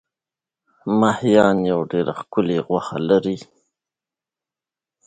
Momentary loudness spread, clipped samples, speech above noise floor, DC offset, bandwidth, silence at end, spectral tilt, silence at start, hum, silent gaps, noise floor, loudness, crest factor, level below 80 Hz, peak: 9 LU; under 0.1%; 71 dB; under 0.1%; 9.2 kHz; 1.65 s; -7 dB/octave; 0.85 s; none; none; -89 dBFS; -19 LUFS; 20 dB; -58 dBFS; -2 dBFS